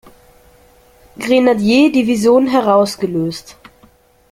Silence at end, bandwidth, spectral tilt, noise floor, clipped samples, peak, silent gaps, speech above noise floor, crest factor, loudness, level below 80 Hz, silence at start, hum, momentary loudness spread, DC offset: 0.8 s; 16 kHz; -5.5 dB/octave; -50 dBFS; under 0.1%; -2 dBFS; none; 37 dB; 14 dB; -13 LUFS; -52 dBFS; 1.2 s; none; 11 LU; under 0.1%